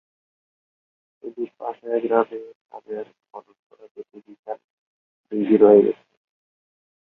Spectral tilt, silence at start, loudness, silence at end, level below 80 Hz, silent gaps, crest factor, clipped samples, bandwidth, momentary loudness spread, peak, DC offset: -10.5 dB/octave; 1.25 s; -19 LUFS; 1.1 s; -70 dBFS; 2.55-2.65 s, 3.59-3.70 s, 3.91-3.95 s, 4.39-4.43 s, 4.64-5.24 s; 22 dB; under 0.1%; 3.9 kHz; 28 LU; -2 dBFS; under 0.1%